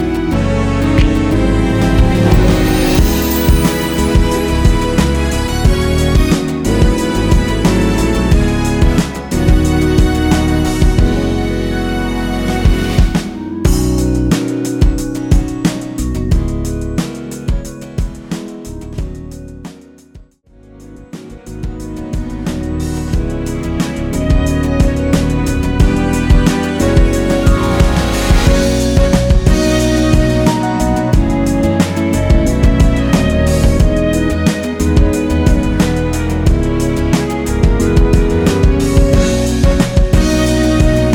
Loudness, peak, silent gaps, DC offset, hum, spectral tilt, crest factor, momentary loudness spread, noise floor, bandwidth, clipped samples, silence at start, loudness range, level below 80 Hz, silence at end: -13 LUFS; 0 dBFS; none; under 0.1%; none; -6 dB/octave; 12 dB; 9 LU; -43 dBFS; 19.5 kHz; under 0.1%; 0 s; 10 LU; -16 dBFS; 0 s